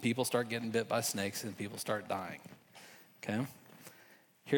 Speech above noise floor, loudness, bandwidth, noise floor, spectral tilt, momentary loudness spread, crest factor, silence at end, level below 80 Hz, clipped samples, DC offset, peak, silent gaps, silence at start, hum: 26 dB; -37 LUFS; over 20 kHz; -63 dBFS; -4 dB/octave; 21 LU; 20 dB; 0 s; -84 dBFS; under 0.1%; under 0.1%; -16 dBFS; none; 0 s; none